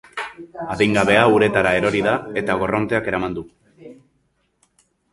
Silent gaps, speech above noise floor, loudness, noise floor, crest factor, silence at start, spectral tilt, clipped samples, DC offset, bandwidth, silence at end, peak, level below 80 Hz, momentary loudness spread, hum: none; 48 dB; -18 LUFS; -66 dBFS; 20 dB; 0.15 s; -5.5 dB/octave; under 0.1%; under 0.1%; 11.5 kHz; 1.2 s; 0 dBFS; -48 dBFS; 16 LU; none